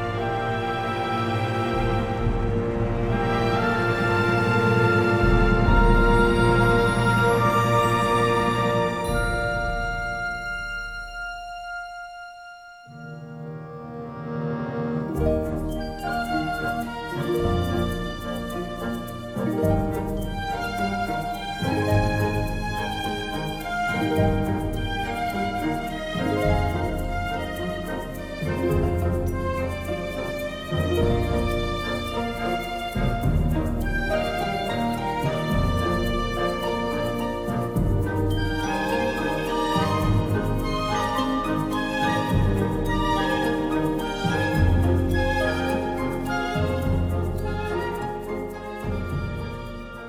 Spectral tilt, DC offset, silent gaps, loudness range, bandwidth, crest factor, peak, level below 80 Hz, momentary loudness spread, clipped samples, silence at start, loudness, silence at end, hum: -6.5 dB/octave; under 0.1%; none; 8 LU; 17.5 kHz; 18 dB; -6 dBFS; -32 dBFS; 11 LU; under 0.1%; 0 s; -24 LUFS; 0 s; none